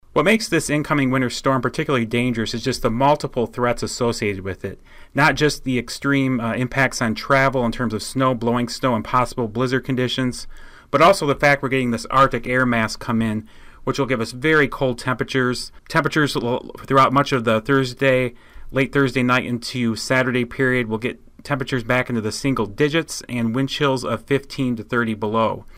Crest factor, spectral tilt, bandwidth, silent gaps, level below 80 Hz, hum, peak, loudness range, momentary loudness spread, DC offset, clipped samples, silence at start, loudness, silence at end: 14 dB; -5 dB/octave; 16 kHz; none; -42 dBFS; none; -6 dBFS; 3 LU; 8 LU; under 0.1%; under 0.1%; 0.15 s; -20 LUFS; 0.15 s